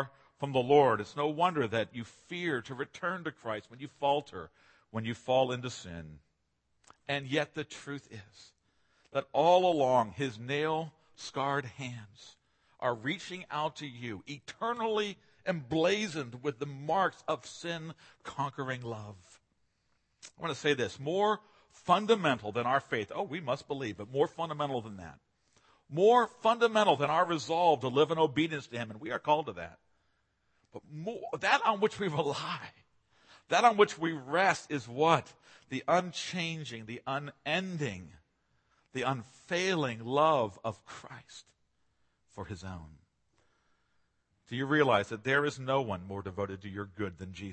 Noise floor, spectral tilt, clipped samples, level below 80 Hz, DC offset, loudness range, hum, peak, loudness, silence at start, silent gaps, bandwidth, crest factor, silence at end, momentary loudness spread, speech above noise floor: -77 dBFS; -5 dB/octave; under 0.1%; -70 dBFS; under 0.1%; 8 LU; none; -8 dBFS; -32 LUFS; 0 s; none; 8.8 kHz; 24 dB; 0 s; 18 LU; 46 dB